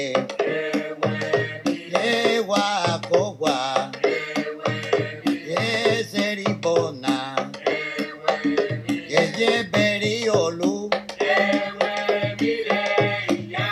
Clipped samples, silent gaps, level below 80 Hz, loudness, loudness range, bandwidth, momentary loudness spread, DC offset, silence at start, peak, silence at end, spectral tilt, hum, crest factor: under 0.1%; none; -66 dBFS; -23 LUFS; 2 LU; 13.5 kHz; 6 LU; under 0.1%; 0 s; 0 dBFS; 0 s; -4.5 dB/octave; none; 22 dB